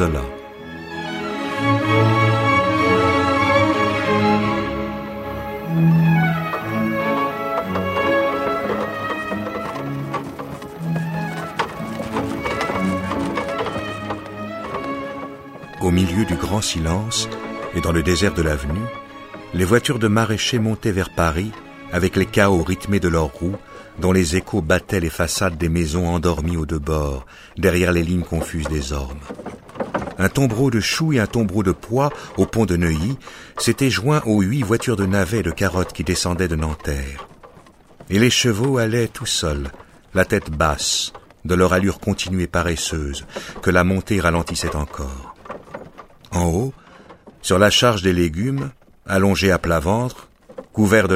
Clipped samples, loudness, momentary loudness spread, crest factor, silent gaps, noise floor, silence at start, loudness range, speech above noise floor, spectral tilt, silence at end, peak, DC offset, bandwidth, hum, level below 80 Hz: under 0.1%; -20 LUFS; 13 LU; 18 dB; none; -47 dBFS; 0 s; 6 LU; 28 dB; -5 dB/octave; 0 s; 0 dBFS; under 0.1%; 16 kHz; none; -36 dBFS